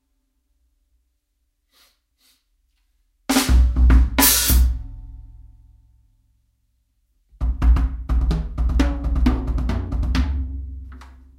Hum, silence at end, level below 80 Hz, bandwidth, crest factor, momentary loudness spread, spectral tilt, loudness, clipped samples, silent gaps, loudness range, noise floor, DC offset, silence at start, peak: none; 0.3 s; -22 dBFS; 16 kHz; 22 dB; 20 LU; -4 dB/octave; -20 LUFS; under 0.1%; none; 9 LU; -71 dBFS; under 0.1%; 3.3 s; 0 dBFS